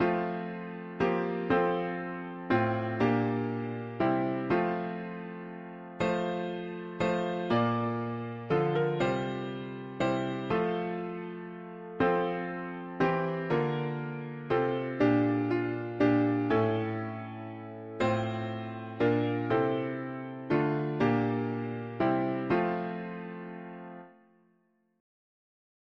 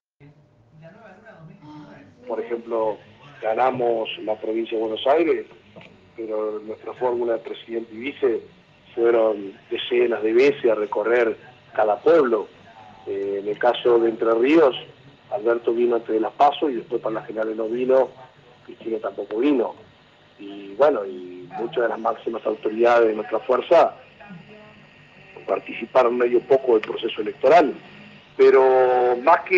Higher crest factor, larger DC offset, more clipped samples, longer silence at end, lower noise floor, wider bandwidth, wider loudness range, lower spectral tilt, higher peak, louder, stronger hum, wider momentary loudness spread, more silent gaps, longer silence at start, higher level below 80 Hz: about the same, 18 dB vs 18 dB; neither; neither; first, 1.9 s vs 0 s; first, -71 dBFS vs -53 dBFS; about the same, 7.4 kHz vs 7.2 kHz; about the same, 4 LU vs 6 LU; first, -8 dB/octave vs -6 dB/octave; second, -14 dBFS vs -4 dBFS; second, -31 LUFS vs -21 LUFS; neither; about the same, 13 LU vs 15 LU; neither; second, 0 s vs 0.85 s; first, -62 dBFS vs -70 dBFS